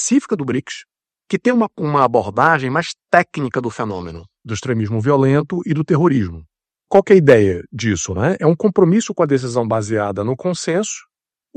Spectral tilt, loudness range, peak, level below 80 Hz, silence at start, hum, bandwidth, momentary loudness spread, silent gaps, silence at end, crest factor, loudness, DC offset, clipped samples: -6 dB/octave; 4 LU; 0 dBFS; -52 dBFS; 0 s; none; 9.2 kHz; 11 LU; none; 0.55 s; 16 dB; -17 LUFS; under 0.1%; 0.1%